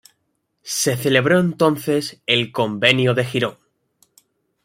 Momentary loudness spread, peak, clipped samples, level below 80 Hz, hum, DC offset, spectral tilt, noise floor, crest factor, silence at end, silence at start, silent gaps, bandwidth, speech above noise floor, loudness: 7 LU; 0 dBFS; under 0.1%; -60 dBFS; none; under 0.1%; -4 dB/octave; -71 dBFS; 20 dB; 1.15 s; 0.65 s; none; 16 kHz; 53 dB; -18 LUFS